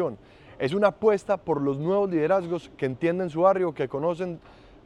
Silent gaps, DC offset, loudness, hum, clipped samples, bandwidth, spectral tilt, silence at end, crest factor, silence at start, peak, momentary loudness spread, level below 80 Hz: none; under 0.1%; -25 LUFS; none; under 0.1%; 10.5 kHz; -7.5 dB/octave; 0.45 s; 18 dB; 0 s; -8 dBFS; 10 LU; -60 dBFS